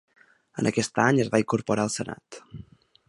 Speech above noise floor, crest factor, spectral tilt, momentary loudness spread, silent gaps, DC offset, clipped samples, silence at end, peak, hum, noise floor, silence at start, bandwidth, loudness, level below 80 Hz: 25 dB; 22 dB; -5 dB/octave; 22 LU; none; under 0.1%; under 0.1%; 0.5 s; -4 dBFS; none; -49 dBFS; 0.55 s; 11.5 kHz; -25 LUFS; -60 dBFS